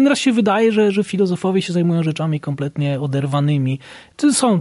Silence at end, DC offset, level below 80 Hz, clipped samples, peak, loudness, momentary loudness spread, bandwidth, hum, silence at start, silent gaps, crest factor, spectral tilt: 0 s; under 0.1%; -60 dBFS; under 0.1%; -4 dBFS; -18 LUFS; 8 LU; 11.5 kHz; none; 0 s; none; 14 dB; -6 dB/octave